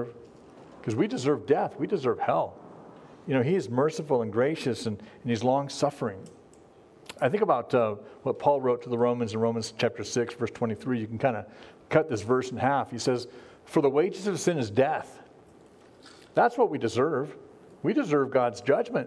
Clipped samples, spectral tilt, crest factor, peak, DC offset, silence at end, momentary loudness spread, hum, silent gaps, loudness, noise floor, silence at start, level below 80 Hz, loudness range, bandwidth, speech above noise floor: under 0.1%; -6 dB/octave; 22 dB; -6 dBFS; under 0.1%; 0 s; 10 LU; none; none; -27 LUFS; -54 dBFS; 0 s; -70 dBFS; 2 LU; 11 kHz; 28 dB